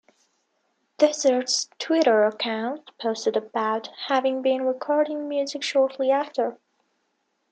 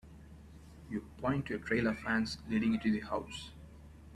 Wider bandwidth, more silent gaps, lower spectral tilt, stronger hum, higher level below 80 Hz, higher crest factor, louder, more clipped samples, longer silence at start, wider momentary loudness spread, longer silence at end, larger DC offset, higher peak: second, 9.2 kHz vs 12 kHz; neither; second, -2.5 dB/octave vs -6 dB/octave; neither; second, -82 dBFS vs -56 dBFS; about the same, 20 dB vs 18 dB; first, -24 LUFS vs -35 LUFS; neither; first, 1 s vs 0.05 s; second, 9 LU vs 22 LU; first, 0.95 s vs 0 s; neither; first, -6 dBFS vs -18 dBFS